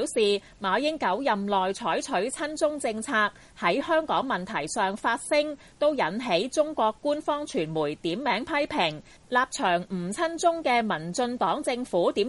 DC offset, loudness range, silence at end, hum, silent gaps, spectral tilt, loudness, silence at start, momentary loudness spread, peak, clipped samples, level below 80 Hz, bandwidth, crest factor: under 0.1%; 1 LU; 0 s; none; none; -4 dB/octave; -27 LUFS; 0 s; 4 LU; -10 dBFS; under 0.1%; -60 dBFS; 11.5 kHz; 16 dB